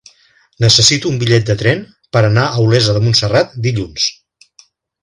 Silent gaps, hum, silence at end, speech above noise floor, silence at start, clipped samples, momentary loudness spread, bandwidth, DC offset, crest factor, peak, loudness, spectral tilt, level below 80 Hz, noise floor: none; none; 0.9 s; 40 dB; 0.6 s; under 0.1%; 10 LU; 11 kHz; under 0.1%; 14 dB; 0 dBFS; -13 LUFS; -4 dB/octave; -42 dBFS; -52 dBFS